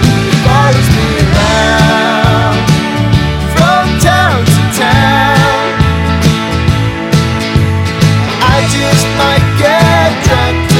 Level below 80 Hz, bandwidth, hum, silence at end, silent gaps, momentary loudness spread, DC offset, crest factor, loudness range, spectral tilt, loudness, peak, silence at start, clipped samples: -24 dBFS; 16.5 kHz; none; 0 s; none; 4 LU; under 0.1%; 8 dB; 2 LU; -5 dB/octave; -9 LUFS; 0 dBFS; 0 s; 0.2%